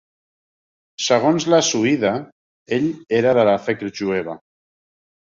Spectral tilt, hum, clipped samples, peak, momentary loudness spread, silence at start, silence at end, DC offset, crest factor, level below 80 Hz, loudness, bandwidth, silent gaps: -4 dB/octave; none; under 0.1%; -2 dBFS; 10 LU; 1 s; 0.85 s; under 0.1%; 18 dB; -60 dBFS; -19 LUFS; 7.6 kHz; 2.32-2.66 s